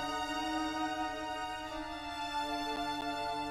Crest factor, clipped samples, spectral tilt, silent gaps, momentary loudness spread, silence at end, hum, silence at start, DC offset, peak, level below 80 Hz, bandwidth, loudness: 14 dB; under 0.1%; -3 dB/octave; none; 5 LU; 0 s; none; 0 s; under 0.1%; -22 dBFS; -58 dBFS; 16 kHz; -37 LUFS